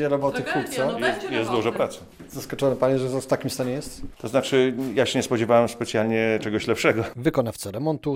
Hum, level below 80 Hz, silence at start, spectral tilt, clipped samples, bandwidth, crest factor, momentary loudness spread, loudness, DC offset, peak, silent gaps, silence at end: none; -52 dBFS; 0 s; -5 dB/octave; under 0.1%; 16 kHz; 18 dB; 8 LU; -24 LUFS; under 0.1%; -6 dBFS; none; 0 s